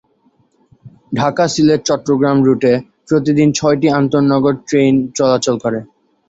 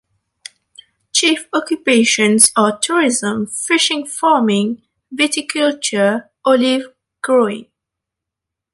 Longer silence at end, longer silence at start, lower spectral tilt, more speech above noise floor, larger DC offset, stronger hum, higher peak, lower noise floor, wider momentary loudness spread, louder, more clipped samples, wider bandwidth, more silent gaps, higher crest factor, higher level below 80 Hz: second, 0.45 s vs 1.1 s; second, 0.85 s vs 1.15 s; first, -6 dB/octave vs -2.5 dB/octave; second, 44 dB vs 68 dB; neither; neither; about the same, -2 dBFS vs 0 dBFS; second, -57 dBFS vs -83 dBFS; second, 6 LU vs 10 LU; about the same, -14 LUFS vs -15 LUFS; neither; second, 8 kHz vs 16 kHz; neither; about the same, 14 dB vs 16 dB; first, -52 dBFS vs -64 dBFS